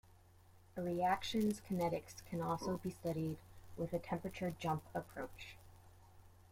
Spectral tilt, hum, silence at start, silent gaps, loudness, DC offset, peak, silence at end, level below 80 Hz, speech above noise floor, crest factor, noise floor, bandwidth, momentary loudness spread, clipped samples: -6 dB/octave; none; 0.5 s; none; -41 LUFS; under 0.1%; -24 dBFS; 0.1 s; -66 dBFS; 24 dB; 18 dB; -65 dBFS; 16.5 kHz; 15 LU; under 0.1%